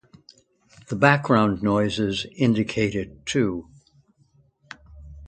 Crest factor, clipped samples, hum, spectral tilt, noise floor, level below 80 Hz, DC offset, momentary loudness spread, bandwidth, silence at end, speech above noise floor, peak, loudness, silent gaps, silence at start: 24 dB; under 0.1%; none; -6 dB/octave; -61 dBFS; -50 dBFS; under 0.1%; 15 LU; 9.2 kHz; 0 s; 39 dB; 0 dBFS; -22 LUFS; none; 0.9 s